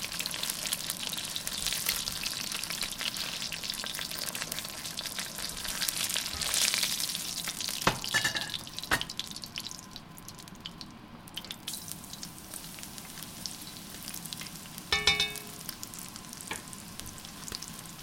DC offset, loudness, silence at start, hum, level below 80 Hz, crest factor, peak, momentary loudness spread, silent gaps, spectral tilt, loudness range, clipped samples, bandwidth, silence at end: under 0.1%; -33 LUFS; 0 s; none; -56 dBFS; 34 dB; -2 dBFS; 14 LU; none; -0.5 dB/octave; 11 LU; under 0.1%; 17 kHz; 0 s